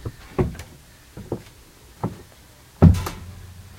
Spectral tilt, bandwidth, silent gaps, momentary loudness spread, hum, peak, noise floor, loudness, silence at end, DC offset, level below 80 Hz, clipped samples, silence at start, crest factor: -8 dB/octave; 16 kHz; none; 27 LU; none; 0 dBFS; -49 dBFS; -23 LUFS; 0.3 s; under 0.1%; -36 dBFS; under 0.1%; 0.05 s; 24 dB